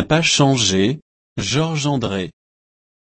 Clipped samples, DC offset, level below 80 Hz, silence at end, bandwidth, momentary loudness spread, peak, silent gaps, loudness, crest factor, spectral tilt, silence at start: under 0.1%; under 0.1%; -48 dBFS; 0.8 s; 8.8 kHz; 16 LU; -2 dBFS; 1.02-1.36 s; -18 LUFS; 16 dB; -4 dB/octave; 0 s